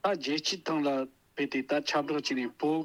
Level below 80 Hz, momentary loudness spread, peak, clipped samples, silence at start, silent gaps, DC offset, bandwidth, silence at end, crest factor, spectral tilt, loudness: -78 dBFS; 5 LU; -16 dBFS; under 0.1%; 0.05 s; none; under 0.1%; 13 kHz; 0 s; 14 dB; -4 dB/octave; -31 LUFS